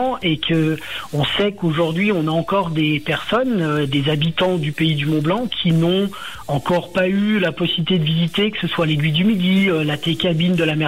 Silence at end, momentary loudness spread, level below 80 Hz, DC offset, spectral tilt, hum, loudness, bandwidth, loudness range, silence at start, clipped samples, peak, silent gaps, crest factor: 0 s; 4 LU; -48 dBFS; 0.5%; -6.5 dB/octave; none; -18 LUFS; 15.5 kHz; 1 LU; 0 s; under 0.1%; -8 dBFS; none; 10 dB